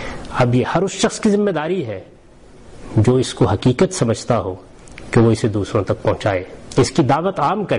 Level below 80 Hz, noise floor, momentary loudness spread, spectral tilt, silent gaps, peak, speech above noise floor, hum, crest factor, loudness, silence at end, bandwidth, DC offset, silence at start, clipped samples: -42 dBFS; -44 dBFS; 8 LU; -6 dB/octave; none; -6 dBFS; 27 dB; none; 12 dB; -18 LUFS; 0 s; 11 kHz; 0.4%; 0 s; under 0.1%